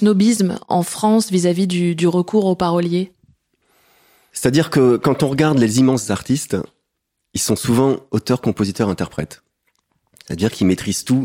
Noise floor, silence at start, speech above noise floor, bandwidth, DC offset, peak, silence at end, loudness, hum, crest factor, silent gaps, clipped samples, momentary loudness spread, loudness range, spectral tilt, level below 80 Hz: -75 dBFS; 0 s; 59 dB; 16.5 kHz; under 0.1%; -2 dBFS; 0 s; -17 LUFS; none; 16 dB; none; under 0.1%; 10 LU; 3 LU; -5.5 dB/octave; -50 dBFS